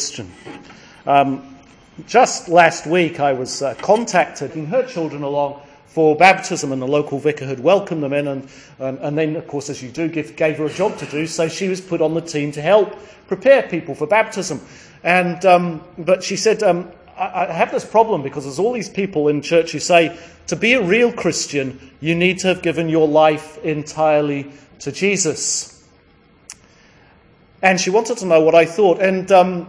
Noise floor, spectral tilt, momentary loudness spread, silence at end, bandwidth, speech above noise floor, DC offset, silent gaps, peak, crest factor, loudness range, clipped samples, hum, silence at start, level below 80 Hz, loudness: -52 dBFS; -4.5 dB/octave; 13 LU; 0 s; 10.5 kHz; 35 dB; under 0.1%; none; 0 dBFS; 18 dB; 5 LU; under 0.1%; none; 0 s; -58 dBFS; -17 LUFS